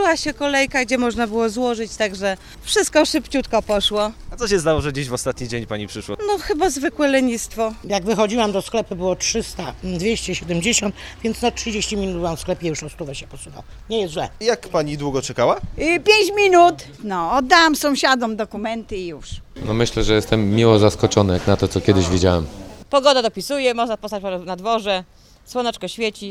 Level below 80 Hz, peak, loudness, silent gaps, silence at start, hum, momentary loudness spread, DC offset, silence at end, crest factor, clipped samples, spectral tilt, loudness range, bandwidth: -38 dBFS; 0 dBFS; -19 LUFS; none; 0 s; none; 13 LU; under 0.1%; 0 s; 20 dB; under 0.1%; -4 dB/octave; 7 LU; 16 kHz